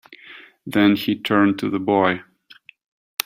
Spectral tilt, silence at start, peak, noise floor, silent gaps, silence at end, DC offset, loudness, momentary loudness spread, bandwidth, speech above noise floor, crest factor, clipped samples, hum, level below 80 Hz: -5.5 dB/octave; 0.1 s; 0 dBFS; -50 dBFS; none; 1.05 s; under 0.1%; -19 LUFS; 20 LU; 16 kHz; 31 dB; 22 dB; under 0.1%; none; -62 dBFS